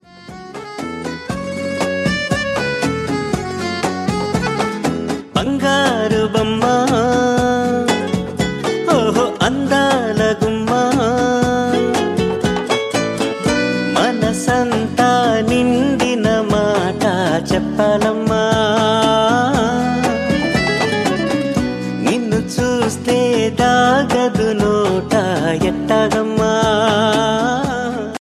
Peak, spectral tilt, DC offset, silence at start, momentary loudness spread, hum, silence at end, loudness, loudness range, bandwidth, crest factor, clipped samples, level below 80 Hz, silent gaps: 0 dBFS; -5 dB/octave; under 0.1%; 0.15 s; 6 LU; none; 0.05 s; -16 LUFS; 4 LU; 14.5 kHz; 16 dB; under 0.1%; -38 dBFS; none